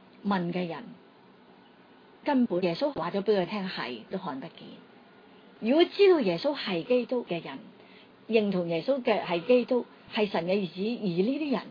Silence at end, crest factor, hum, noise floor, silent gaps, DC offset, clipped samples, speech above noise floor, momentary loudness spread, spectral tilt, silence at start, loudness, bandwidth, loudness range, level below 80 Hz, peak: 0 s; 20 dB; none; -56 dBFS; none; under 0.1%; under 0.1%; 28 dB; 12 LU; -8 dB/octave; 0.25 s; -28 LUFS; 5.2 kHz; 4 LU; -74 dBFS; -10 dBFS